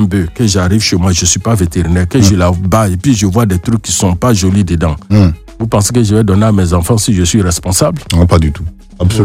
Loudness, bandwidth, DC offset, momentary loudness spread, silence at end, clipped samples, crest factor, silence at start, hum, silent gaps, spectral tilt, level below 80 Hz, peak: -11 LUFS; 16 kHz; under 0.1%; 4 LU; 0 s; 0.3%; 10 dB; 0 s; none; none; -5.5 dB/octave; -24 dBFS; 0 dBFS